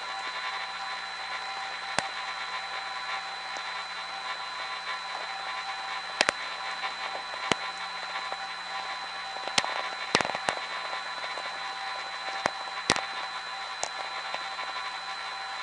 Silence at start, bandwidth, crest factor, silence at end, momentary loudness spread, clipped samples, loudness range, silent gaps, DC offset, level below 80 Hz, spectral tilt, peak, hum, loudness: 0 s; 10.5 kHz; 32 dB; 0 s; 7 LU; under 0.1%; 3 LU; none; under 0.1%; -68 dBFS; -1 dB/octave; -2 dBFS; none; -32 LUFS